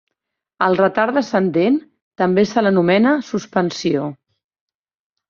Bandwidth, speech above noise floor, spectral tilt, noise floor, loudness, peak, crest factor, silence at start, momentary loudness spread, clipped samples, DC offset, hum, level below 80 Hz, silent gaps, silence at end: 7.4 kHz; 63 dB; -6.5 dB/octave; -80 dBFS; -17 LUFS; -2 dBFS; 16 dB; 0.6 s; 7 LU; under 0.1%; under 0.1%; none; -60 dBFS; 2.02-2.11 s; 1.15 s